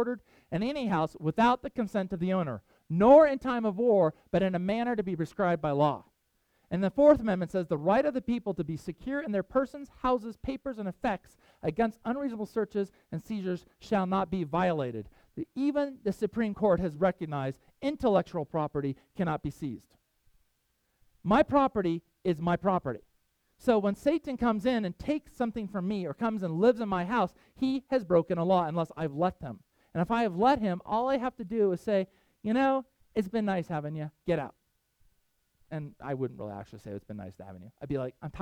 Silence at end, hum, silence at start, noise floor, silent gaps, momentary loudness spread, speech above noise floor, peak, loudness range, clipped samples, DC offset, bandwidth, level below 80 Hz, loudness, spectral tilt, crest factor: 0 s; none; 0 s; -76 dBFS; none; 13 LU; 47 dB; -10 dBFS; 8 LU; under 0.1%; under 0.1%; 13.5 kHz; -56 dBFS; -30 LUFS; -8 dB/octave; 20 dB